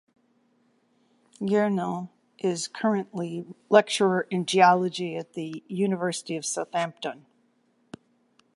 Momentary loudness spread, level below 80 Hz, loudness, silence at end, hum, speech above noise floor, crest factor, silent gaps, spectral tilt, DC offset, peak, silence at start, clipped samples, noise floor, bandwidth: 16 LU; -76 dBFS; -26 LUFS; 1.4 s; none; 42 dB; 24 dB; none; -4.5 dB/octave; under 0.1%; -2 dBFS; 1.4 s; under 0.1%; -67 dBFS; 11.5 kHz